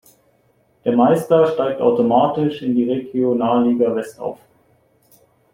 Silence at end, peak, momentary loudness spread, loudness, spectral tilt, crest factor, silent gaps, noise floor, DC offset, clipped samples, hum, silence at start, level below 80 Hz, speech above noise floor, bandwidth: 1.2 s; -2 dBFS; 10 LU; -17 LUFS; -7.5 dB/octave; 16 dB; none; -59 dBFS; under 0.1%; under 0.1%; none; 0.85 s; -60 dBFS; 43 dB; 15.5 kHz